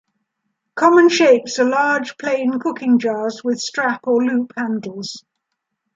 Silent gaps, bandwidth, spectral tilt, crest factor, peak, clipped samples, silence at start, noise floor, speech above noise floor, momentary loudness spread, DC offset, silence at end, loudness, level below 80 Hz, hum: none; 7.8 kHz; -4 dB/octave; 16 dB; 0 dBFS; under 0.1%; 0.75 s; -77 dBFS; 60 dB; 14 LU; under 0.1%; 0.75 s; -17 LUFS; -72 dBFS; none